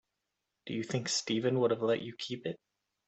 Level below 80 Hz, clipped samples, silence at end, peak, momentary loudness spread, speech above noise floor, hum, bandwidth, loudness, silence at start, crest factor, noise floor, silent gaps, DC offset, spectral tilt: -76 dBFS; under 0.1%; 0.5 s; -16 dBFS; 12 LU; 53 dB; none; 8.4 kHz; -33 LUFS; 0.65 s; 18 dB; -86 dBFS; none; under 0.1%; -4.5 dB/octave